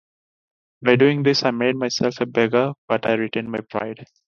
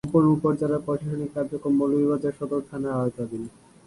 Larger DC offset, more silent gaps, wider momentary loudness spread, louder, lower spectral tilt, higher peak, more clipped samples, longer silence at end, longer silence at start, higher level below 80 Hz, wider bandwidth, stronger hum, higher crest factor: neither; first, 2.78-2.88 s vs none; about the same, 12 LU vs 11 LU; first, -20 LUFS vs -25 LUFS; second, -5.5 dB/octave vs -9.5 dB/octave; first, 0 dBFS vs -8 dBFS; neither; about the same, 0.3 s vs 0.4 s; first, 0.8 s vs 0.05 s; second, -62 dBFS vs -56 dBFS; second, 7.2 kHz vs 11.5 kHz; neither; about the same, 20 dB vs 16 dB